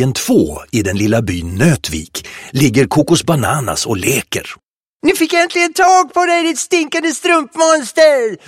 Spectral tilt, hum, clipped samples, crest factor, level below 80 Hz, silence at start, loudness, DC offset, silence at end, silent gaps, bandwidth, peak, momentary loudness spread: -4.5 dB/octave; none; under 0.1%; 14 dB; -40 dBFS; 0 s; -13 LUFS; under 0.1%; 0.1 s; 4.63-5.00 s; 16.5 kHz; 0 dBFS; 10 LU